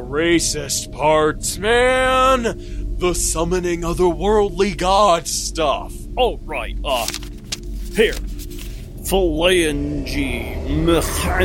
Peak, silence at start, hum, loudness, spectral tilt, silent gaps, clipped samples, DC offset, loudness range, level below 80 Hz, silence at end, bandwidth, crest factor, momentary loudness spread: -2 dBFS; 0 s; none; -18 LUFS; -4 dB/octave; none; under 0.1%; under 0.1%; 5 LU; -28 dBFS; 0 s; 17 kHz; 16 dB; 14 LU